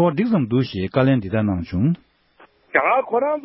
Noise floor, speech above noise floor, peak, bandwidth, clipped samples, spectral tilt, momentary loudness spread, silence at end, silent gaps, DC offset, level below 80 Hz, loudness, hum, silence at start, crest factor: -53 dBFS; 34 dB; -2 dBFS; 5.8 kHz; under 0.1%; -12 dB/octave; 5 LU; 0 s; none; under 0.1%; -44 dBFS; -20 LUFS; none; 0 s; 18 dB